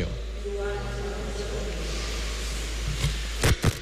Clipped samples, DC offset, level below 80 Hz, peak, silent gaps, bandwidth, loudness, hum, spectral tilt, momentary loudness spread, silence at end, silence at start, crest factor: under 0.1%; under 0.1%; -32 dBFS; -12 dBFS; none; 15.5 kHz; -30 LUFS; none; -4.5 dB/octave; 8 LU; 0 s; 0 s; 16 dB